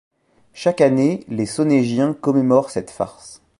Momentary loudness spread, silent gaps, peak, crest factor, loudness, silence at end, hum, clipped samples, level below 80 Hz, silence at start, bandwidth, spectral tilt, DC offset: 12 LU; none; -2 dBFS; 18 dB; -19 LUFS; 0.25 s; none; under 0.1%; -58 dBFS; 0.55 s; 11.5 kHz; -6.5 dB/octave; under 0.1%